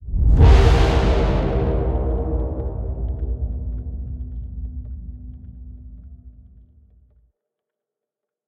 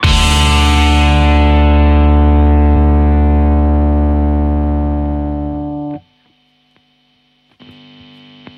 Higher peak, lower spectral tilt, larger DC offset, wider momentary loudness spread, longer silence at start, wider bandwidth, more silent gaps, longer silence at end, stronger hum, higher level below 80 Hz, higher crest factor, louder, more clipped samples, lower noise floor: about the same, -2 dBFS vs 0 dBFS; first, -7.5 dB/octave vs -6 dB/octave; neither; first, 25 LU vs 10 LU; about the same, 0 s vs 0 s; second, 7.8 kHz vs 11 kHz; neither; second, 2.15 s vs 2.6 s; neither; second, -22 dBFS vs -14 dBFS; first, 18 dB vs 12 dB; second, -20 LUFS vs -12 LUFS; neither; first, -85 dBFS vs -56 dBFS